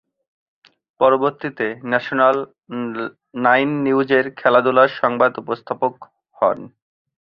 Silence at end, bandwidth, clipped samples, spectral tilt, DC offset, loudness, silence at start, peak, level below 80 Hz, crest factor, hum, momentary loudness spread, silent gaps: 0.55 s; 5.8 kHz; under 0.1%; -8 dB/octave; under 0.1%; -18 LUFS; 1 s; -2 dBFS; -64 dBFS; 18 dB; none; 12 LU; none